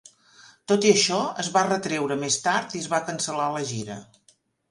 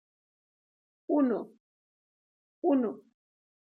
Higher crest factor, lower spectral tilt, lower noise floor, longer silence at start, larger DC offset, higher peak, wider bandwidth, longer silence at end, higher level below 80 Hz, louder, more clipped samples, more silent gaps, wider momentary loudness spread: about the same, 22 dB vs 18 dB; second, -3 dB/octave vs -9.5 dB/octave; second, -63 dBFS vs under -90 dBFS; second, 0.45 s vs 1.1 s; neither; first, -4 dBFS vs -16 dBFS; first, 11.5 kHz vs 3.2 kHz; about the same, 0.7 s vs 0.7 s; first, -68 dBFS vs -90 dBFS; first, -24 LUFS vs -30 LUFS; neither; second, none vs 1.60-2.62 s; second, 13 LU vs 20 LU